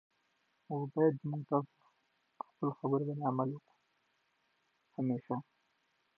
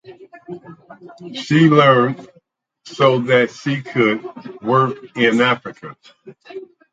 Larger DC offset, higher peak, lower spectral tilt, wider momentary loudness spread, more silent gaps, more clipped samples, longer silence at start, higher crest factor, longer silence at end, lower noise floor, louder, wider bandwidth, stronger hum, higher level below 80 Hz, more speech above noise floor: neither; second, -18 dBFS vs 0 dBFS; first, -10.5 dB/octave vs -6.5 dB/octave; second, 18 LU vs 24 LU; neither; neither; first, 0.7 s vs 0.1 s; about the same, 20 dB vs 18 dB; first, 0.75 s vs 0.3 s; first, -78 dBFS vs -57 dBFS; second, -36 LUFS vs -16 LUFS; second, 4.3 kHz vs 9 kHz; neither; second, -88 dBFS vs -64 dBFS; about the same, 43 dB vs 41 dB